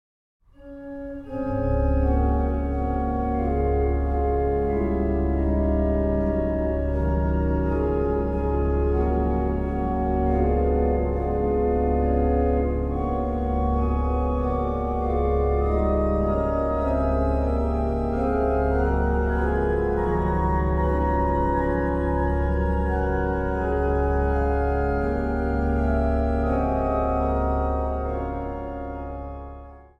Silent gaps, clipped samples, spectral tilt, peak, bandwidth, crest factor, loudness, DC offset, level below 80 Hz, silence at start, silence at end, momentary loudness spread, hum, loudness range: none; under 0.1%; -10.5 dB/octave; -10 dBFS; 4.2 kHz; 14 dB; -24 LUFS; under 0.1%; -26 dBFS; 0.6 s; 0.15 s; 4 LU; none; 1 LU